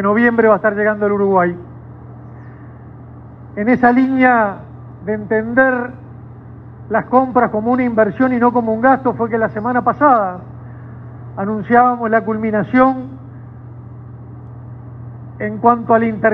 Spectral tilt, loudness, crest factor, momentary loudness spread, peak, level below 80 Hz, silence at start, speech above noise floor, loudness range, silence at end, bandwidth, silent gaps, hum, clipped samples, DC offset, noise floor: -10 dB/octave; -15 LUFS; 16 dB; 24 LU; 0 dBFS; -48 dBFS; 0 s; 21 dB; 5 LU; 0 s; 4.6 kHz; none; none; under 0.1%; under 0.1%; -35 dBFS